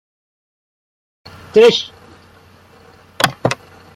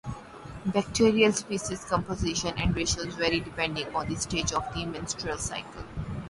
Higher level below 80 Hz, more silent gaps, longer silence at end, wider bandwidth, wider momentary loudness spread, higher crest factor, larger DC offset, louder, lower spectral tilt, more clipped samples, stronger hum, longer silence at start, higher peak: second, -54 dBFS vs -44 dBFS; neither; first, 0.4 s vs 0 s; first, 16.5 kHz vs 11.5 kHz; about the same, 15 LU vs 13 LU; about the same, 20 dB vs 20 dB; neither; first, -15 LUFS vs -28 LUFS; about the same, -4 dB/octave vs -4 dB/octave; neither; neither; first, 1.55 s vs 0.05 s; first, 0 dBFS vs -8 dBFS